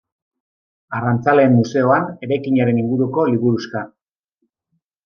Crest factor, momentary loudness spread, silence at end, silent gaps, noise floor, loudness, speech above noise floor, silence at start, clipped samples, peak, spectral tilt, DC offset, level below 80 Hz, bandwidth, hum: 16 dB; 13 LU; 1.2 s; none; -72 dBFS; -17 LUFS; 56 dB; 0.9 s; under 0.1%; -2 dBFS; -8 dB/octave; under 0.1%; -64 dBFS; 6.8 kHz; none